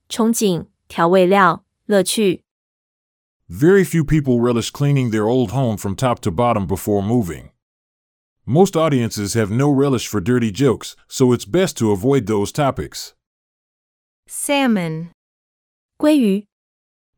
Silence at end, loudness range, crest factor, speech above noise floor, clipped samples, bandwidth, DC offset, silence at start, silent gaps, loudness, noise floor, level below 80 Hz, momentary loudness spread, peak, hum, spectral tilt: 0.75 s; 4 LU; 18 dB; over 73 dB; under 0.1%; 19.5 kHz; under 0.1%; 0.1 s; 2.51-3.40 s, 7.62-8.36 s, 13.27-14.23 s, 15.14-15.89 s; -17 LUFS; under -90 dBFS; -46 dBFS; 13 LU; 0 dBFS; none; -6 dB/octave